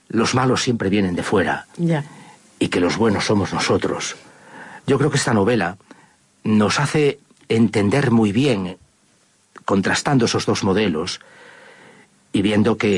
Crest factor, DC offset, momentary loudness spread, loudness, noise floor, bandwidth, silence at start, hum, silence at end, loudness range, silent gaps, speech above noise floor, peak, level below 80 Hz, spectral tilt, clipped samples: 14 dB; under 0.1%; 11 LU; -19 LUFS; -58 dBFS; 11.5 kHz; 0.15 s; none; 0 s; 2 LU; none; 40 dB; -6 dBFS; -56 dBFS; -5.5 dB/octave; under 0.1%